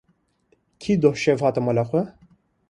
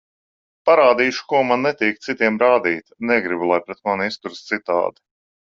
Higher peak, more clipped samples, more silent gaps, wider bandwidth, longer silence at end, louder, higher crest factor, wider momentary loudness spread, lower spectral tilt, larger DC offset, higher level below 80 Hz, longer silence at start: about the same, -4 dBFS vs -2 dBFS; neither; neither; first, 11 kHz vs 7.6 kHz; about the same, 0.6 s vs 0.65 s; about the same, -21 LUFS vs -19 LUFS; about the same, 18 dB vs 18 dB; about the same, 11 LU vs 11 LU; first, -7 dB/octave vs -5 dB/octave; neither; first, -58 dBFS vs -64 dBFS; first, 0.8 s vs 0.65 s